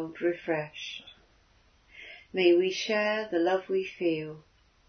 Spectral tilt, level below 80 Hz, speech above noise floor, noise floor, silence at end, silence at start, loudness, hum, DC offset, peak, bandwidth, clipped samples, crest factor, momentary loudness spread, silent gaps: -5 dB/octave; -68 dBFS; 35 dB; -63 dBFS; 0.5 s; 0 s; -29 LUFS; none; under 0.1%; -12 dBFS; 6.6 kHz; under 0.1%; 18 dB; 21 LU; none